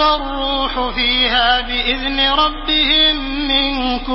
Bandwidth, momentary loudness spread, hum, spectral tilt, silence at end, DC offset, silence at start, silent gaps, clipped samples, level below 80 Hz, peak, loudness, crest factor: 5.8 kHz; 7 LU; none; -7 dB/octave; 0 s; under 0.1%; 0 s; none; under 0.1%; -30 dBFS; -2 dBFS; -14 LUFS; 14 dB